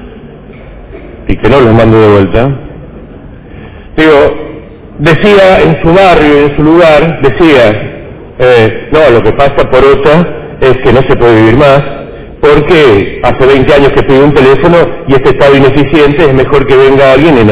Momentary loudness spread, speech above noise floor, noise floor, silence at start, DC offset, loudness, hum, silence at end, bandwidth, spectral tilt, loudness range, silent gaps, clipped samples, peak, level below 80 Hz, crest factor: 8 LU; 24 dB; -27 dBFS; 0 s; under 0.1%; -5 LUFS; none; 0 s; 4 kHz; -10.5 dB/octave; 4 LU; none; 20%; 0 dBFS; -24 dBFS; 4 dB